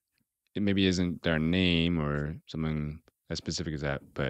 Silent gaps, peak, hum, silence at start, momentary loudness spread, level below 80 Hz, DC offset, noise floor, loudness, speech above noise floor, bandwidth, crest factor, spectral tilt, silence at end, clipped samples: none; -12 dBFS; none; 0.55 s; 12 LU; -48 dBFS; under 0.1%; -79 dBFS; -30 LUFS; 49 dB; 8.8 kHz; 18 dB; -5.5 dB/octave; 0 s; under 0.1%